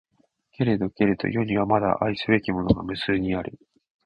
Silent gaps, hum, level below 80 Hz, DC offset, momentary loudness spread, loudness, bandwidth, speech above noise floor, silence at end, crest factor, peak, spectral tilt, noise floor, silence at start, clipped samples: none; none; -46 dBFS; under 0.1%; 5 LU; -24 LUFS; 9.8 kHz; 42 dB; 0.55 s; 20 dB; -4 dBFS; -8.5 dB/octave; -66 dBFS; 0.6 s; under 0.1%